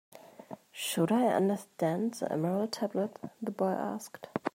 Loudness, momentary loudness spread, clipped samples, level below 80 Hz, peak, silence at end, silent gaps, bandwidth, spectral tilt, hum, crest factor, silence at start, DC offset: -32 LUFS; 14 LU; under 0.1%; -80 dBFS; -14 dBFS; 0.05 s; none; 16 kHz; -5.5 dB/octave; none; 18 dB; 0.15 s; under 0.1%